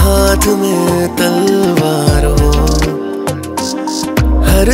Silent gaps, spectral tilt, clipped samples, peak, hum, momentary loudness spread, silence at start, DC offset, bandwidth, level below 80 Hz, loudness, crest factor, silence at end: none; -5.5 dB/octave; under 0.1%; 0 dBFS; none; 8 LU; 0 s; under 0.1%; 16.5 kHz; -16 dBFS; -12 LUFS; 10 dB; 0 s